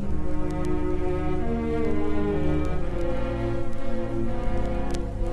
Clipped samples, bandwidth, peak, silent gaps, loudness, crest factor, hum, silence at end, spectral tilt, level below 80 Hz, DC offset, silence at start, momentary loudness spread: under 0.1%; 7.6 kHz; -10 dBFS; none; -29 LUFS; 12 dB; none; 0 s; -8 dB/octave; -30 dBFS; under 0.1%; 0 s; 4 LU